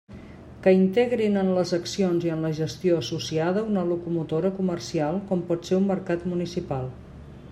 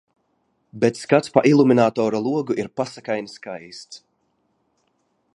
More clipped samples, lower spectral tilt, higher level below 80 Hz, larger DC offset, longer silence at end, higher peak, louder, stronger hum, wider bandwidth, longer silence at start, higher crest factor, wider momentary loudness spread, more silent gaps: neither; about the same, -6.5 dB/octave vs -6.5 dB/octave; first, -54 dBFS vs -66 dBFS; neither; second, 0 s vs 1.4 s; second, -6 dBFS vs 0 dBFS; second, -25 LUFS vs -20 LUFS; neither; about the same, 11.5 kHz vs 11 kHz; second, 0.1 s vs 0.75 s; about the same, 18 dB vs 22 dB; second, 10 LU vs 20 LU; neither